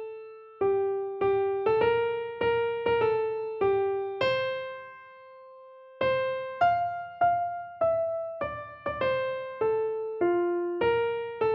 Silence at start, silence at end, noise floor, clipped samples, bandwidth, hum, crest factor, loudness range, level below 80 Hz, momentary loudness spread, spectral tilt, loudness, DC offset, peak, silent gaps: 0 s; 0 s; -50 dBFS; under 0.1%; 5.8 kHz; none; 16 dB; 3 LU; -60 dBFS; 10 LU; -7.5 dB/octave; -28 LUFS; under 0.1%; -12 dBFS; none